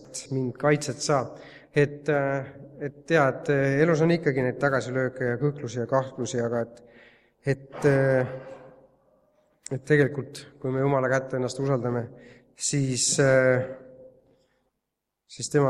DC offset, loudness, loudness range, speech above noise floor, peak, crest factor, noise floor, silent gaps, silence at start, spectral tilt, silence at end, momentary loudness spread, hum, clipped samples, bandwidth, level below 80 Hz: under 0.1%; -25 LUFS; 4 LU; 58 dB; -6 dBFS; 20 dB; -83 dBFS; none; 0.1 s; -5 dB/octave; 0 s; 16 LU; none; under 0.1%; 12 kHz; -62 dBFS